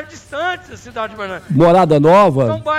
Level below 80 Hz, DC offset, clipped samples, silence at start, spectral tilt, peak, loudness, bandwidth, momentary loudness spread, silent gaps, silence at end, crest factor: -48 dBFS; under 0.1%; under 0.1%; 0 s; -7 dB/octave; -4 dBFS; -13 LUFS; 14 kHz; 17 LU; none; 0 s; 10 dB